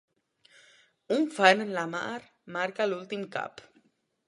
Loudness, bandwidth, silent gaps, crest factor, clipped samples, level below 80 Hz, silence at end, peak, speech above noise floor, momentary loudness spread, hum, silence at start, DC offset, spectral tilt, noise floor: -28 LUFS; 11.5 kHz; none; 28 dB; under 0.1%; -80 dBFS; 0.65 s; -4 dBFS; 40 dB; 16 LU; none; 1.1 s; under 0.1%; -4 dB/octave; -68 dBFS